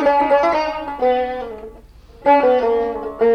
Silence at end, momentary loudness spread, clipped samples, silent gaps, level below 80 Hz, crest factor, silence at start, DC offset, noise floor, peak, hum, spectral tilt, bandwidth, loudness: 0 s; 12 LU; under 0.1%; none; -46 dBFS; 14 dB; 0 s; under 0.1%; -42 dBFS; -4 dBFS; none; -5.5 dB/octave; 6.6 kHz; -17 LUFS